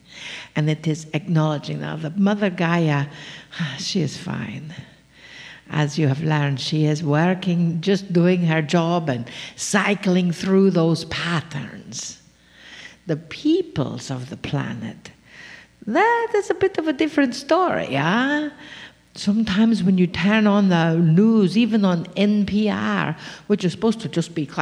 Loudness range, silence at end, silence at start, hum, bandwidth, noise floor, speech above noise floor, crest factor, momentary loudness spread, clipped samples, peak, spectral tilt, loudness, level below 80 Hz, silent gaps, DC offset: 8 LU; 0 s; 0.1 s; none; 11.5 kHz; -49 dBFS; 28 dB; 18 dB; 16 LU; under 0.1%; -4 dBFS; -6 dB/octave; -21 LUFS; -56 dBFS; none; under 0.1%